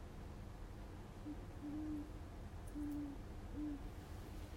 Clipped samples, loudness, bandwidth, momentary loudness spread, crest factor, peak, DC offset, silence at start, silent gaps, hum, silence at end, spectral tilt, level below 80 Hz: under 0.1%; -50 LUFS; 16 kHz; 8 LU; 12 dB; -36 dBFS; under 0.1%; 0 s; none; none; 0 s; -7 dB/octave; -54 dBFS